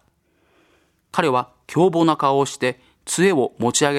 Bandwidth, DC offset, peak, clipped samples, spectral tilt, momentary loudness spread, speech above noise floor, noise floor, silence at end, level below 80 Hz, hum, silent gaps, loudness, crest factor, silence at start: 15.5 kHz; under 0.1%; 0 dBFS; under 0.1%; -4.5 dB/octave; 9 LU; 44 dB; -63 dBFS; 0 s; -62 dBFS; none; none; -20 LUFS; 20 dB; 1.15 s